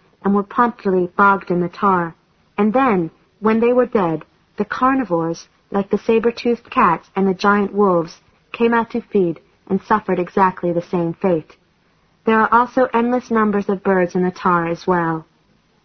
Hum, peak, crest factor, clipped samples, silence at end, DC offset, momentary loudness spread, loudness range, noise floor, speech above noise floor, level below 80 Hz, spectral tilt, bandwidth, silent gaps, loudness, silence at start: none; -2 dBFS; 16 dB; under 0.1%; 0.6 s; under 0.1%; 10 LU; 2 LU; -59 dBFS; 42 dB; -54 dBFS; -7.5 dB/octave; 6.6 kHz; none; -18 LUFS; 0.25 s